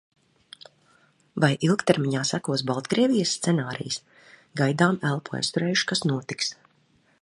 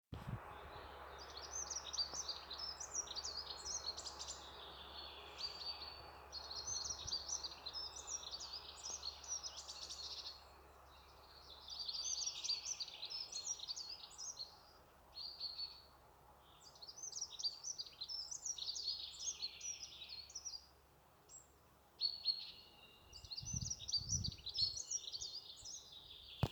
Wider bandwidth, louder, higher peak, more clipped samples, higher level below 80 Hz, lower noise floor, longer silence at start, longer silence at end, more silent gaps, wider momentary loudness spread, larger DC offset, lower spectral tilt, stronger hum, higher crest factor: second, 11.5 kHz vs over 20 kHz; first, -25 LUFS vs -45 LUFS; first, -4 dBFS vs -22 dBFS; neither; about the same, -68 dBFS vs -66 dBFS; second, -64 dBFS vs -68 dBFS; first, 1.35 s vs 0.1 s; first, 0.7 s vs 0 s; neither; second, 8 LU vs 17 LU; neither; first, -4.5 dB/octave vs -1 dB/octave; neither; about the same, 22 dB vs 26 dB